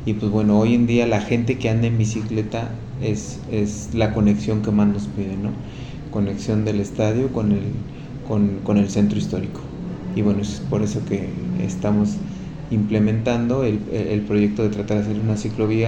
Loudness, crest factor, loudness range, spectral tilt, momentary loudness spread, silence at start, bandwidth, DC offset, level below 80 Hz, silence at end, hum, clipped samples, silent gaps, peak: -21 LUFS; 16 dB; 2 LU; -7.5 dB/octave; 10 LU; 0 s; 8.8 kHz; under 0.1%; -40 dBFS; 0 s; none; under 0.1%; none; -4 dBFS